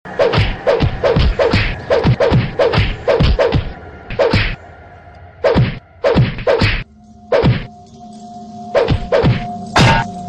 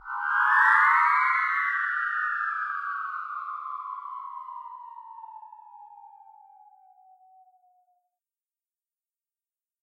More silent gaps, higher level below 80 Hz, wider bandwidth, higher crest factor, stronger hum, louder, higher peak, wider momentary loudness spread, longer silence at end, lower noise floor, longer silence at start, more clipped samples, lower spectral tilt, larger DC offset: neither; first, -24 dBFS vs -82 dBFS; second, 10.5 kHz vs 12.5 kHz; second, 10 dB vs 22 dB; neither; first, -15 LUFS vs -24 LUFS; about the same, -4 dBFS vs -6 dBFS; second, 17 LU vs 25 LU; second, 0 s vs 3.75 s; second, -40 dBFS vs under -90 dBFS; about the same, 0.05 s vs 0.05 s; neither; first, -6.5 dB/octave vs 2.5 dB/octave; first, 0.3% vs under 0.1%